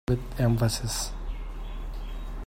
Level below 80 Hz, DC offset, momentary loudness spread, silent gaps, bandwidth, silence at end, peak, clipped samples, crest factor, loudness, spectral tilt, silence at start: -34 dBFS; under 0.1%; 15 LU; none; 16 kHz; 0 s; -12 dBFS; under 0.1%; 18 dB; -30 LUFS; -5 dB/octave; 0.1 s